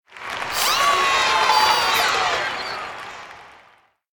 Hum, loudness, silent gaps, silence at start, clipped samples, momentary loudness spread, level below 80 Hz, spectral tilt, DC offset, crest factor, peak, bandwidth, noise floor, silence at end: none; -18 LUFS; none; 0.1 s; under 0.1%; 16 LU; -54 dBFS; 0 dB/octave; under 0.1%; 18 dB; -4 dBFS; 18 kHz; -56 dBFS; 0.65 s